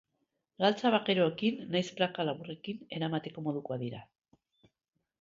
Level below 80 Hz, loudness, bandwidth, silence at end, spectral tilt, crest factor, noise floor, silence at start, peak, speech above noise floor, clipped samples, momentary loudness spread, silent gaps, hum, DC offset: -76 dBFS; -32 LUFS; 7.6 kHz; 1.2 s; -6 dB/octave; 20 dB; -84 dBFS; 0.6 s; -14 dBFS; 52 dB; under 0.1%; 13 LU; none; none; under 0.1%